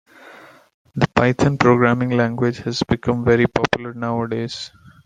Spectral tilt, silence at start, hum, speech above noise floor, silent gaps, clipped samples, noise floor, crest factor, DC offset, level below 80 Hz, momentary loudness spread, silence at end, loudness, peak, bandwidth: -6.5 dB/octave; 0.25 s; none; 26 dB; 0.74-0.85 s; under 0.1%; -44 dBFS; 18 dB; under 0.1%; -46 dBFS; 11 LU; 0.4 s; -19 LUFS; -2 dBFS; 9.4 kHz